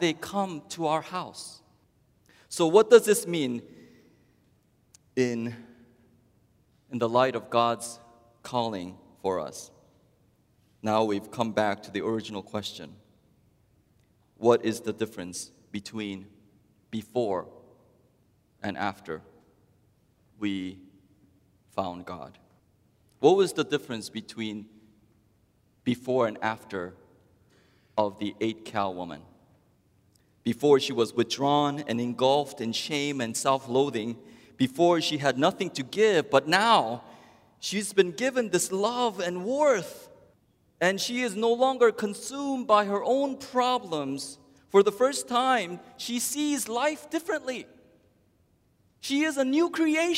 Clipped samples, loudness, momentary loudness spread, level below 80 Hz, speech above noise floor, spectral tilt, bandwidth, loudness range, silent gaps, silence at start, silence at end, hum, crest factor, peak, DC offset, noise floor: under 0.1%; -27 LUFS; 16 LU; -72 dBFS; 40 dB; -4 dB/octave; 16 kHz; 11 LU; none; 0 s; 0 s; none; 24 dB; -4 dBFS; under 0.1%; -66 dBFS